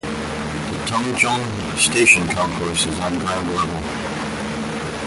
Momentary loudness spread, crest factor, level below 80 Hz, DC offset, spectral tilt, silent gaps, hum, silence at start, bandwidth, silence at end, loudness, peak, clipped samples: 12 LU; 20 dB; -40 dBFS; under 0.1%; -3 dB/octave; none; none; 0.05 s; 12 kHz; 0 s; -19 LUFS; -2 dBFS; under 0.1%